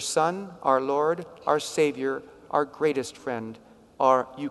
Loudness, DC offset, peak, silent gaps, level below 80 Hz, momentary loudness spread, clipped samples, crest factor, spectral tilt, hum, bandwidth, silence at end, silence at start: -26 LUFS; under 0.1%; -8 dBFS; none; -68 dBFS; 11 LU; under 0.1%; 18 dB; -4 dB/octave; none; 12 kHz; 0 s; 0 s